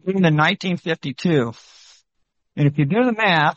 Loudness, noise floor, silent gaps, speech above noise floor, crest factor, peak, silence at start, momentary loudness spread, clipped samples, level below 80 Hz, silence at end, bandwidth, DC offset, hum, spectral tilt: -19 LUFS; -72 dBFS; none; 54 dB; 18 dB; -2 dBFS; 0.05 s; 9 LU; under 0.1%; -60 dBFS; 0.05 s; 7.6 kHz; under 0.1%; none; -7 dB/octave